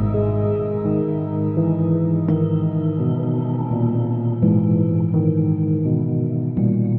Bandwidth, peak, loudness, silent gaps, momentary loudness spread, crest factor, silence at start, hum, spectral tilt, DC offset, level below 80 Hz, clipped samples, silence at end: 3.3 kHz; -6 dBFS; -20 LUFS; none; 4 LU; 14 dB; 0 s; none; -14 dB/octave; under 0.1%; -44 dBFS; under 0.1%; 0 s